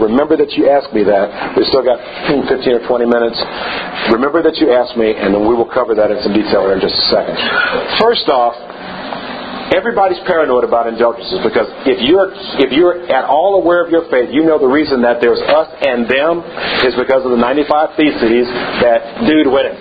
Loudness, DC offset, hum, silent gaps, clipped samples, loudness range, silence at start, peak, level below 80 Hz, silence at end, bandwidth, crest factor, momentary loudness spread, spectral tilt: -12 LUFS; under 0.1%; none; none; under 0.1%; 2 LU; 0 s; 0 dBFS; -44 dBFS; 0 s; 5 kHz; 12 dB; 6 LU; -7.5 dB/octave